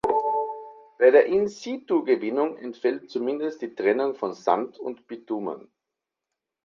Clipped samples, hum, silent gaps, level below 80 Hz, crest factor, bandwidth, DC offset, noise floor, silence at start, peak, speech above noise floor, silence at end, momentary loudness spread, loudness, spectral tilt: under 0.1%; none; none; -68 dBFS; 20 dB; 7.4 kHz; under 0.1%; -86 dBFS; 0.05 s; -6 dBFS; 62 dB; 1.05 s; 16 LU; -25 LUFS; -5.5 dB/octave